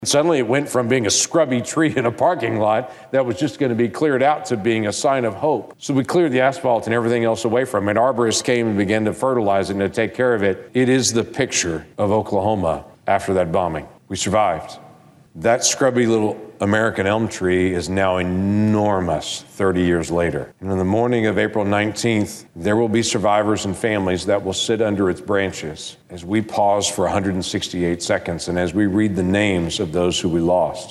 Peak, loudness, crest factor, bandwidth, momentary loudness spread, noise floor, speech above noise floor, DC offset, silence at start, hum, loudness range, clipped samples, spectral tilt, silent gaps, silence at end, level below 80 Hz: -4 dBFS; -19 LUFS; 16 dB; 12.5 kHz; 6 LU; -47 dBFS; 28 dB; under 0.1%; 0 s; none; 2 LU; under 0.1%; -4.5 dB/octave; none; 0 s; -48 dBFS